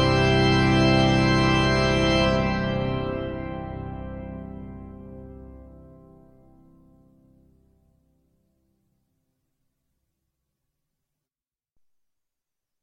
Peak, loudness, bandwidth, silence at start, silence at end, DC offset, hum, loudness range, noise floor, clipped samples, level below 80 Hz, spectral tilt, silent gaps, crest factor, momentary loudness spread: -8 dBFS; -21 LUFS; 10 kHz; 0 s; 7 s; under 0.1%; none; 23 LU; under -90 dBFS; under 0.1%; -40 dBFS; -6 dB/octave; none; 18 dB; 23 LU